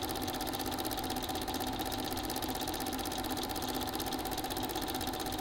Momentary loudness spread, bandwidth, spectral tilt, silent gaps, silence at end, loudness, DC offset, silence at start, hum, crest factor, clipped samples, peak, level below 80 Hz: 1 LU; 17 kHz; -3.5 dB/octave; none; 0 s; -36 LUFS; under 0.1%; 0 s; none; 20 dB; under 0.1%; -16 dBFS; -50 dBFS